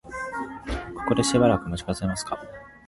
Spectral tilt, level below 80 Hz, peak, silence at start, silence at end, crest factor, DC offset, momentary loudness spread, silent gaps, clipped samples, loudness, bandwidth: -5 dB/octave; -42 dBFS; -6 dBFS; 0.05 s; 0.1 s; 20 dB; under 0.1%; 14 LU; none; under 0.1%; -26 LUFS; 11.5 kHz